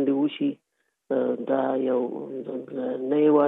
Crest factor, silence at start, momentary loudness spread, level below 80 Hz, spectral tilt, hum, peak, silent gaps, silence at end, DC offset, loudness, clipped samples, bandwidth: 16 dB; 0 s; 10 LU; -80 dBFS; -9.5 dB/octave; none; -8 dBFS; none; 0 s; under 0.1%; -26 LUFS; under 0.1%; 3.9 kHz